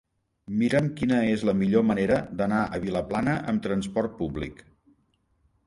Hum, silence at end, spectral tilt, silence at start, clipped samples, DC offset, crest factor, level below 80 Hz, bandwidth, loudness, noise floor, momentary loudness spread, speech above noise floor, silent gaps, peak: none; 1.15 s; -7.5 dB/octave; 0.5 s; under 0.1%; under 0.1%; 18 dB; -50 dBFS; 11.5 kHz; -26 LUFS; -69 dBFS; 9 LU; 44 dB; none; -8 dBFS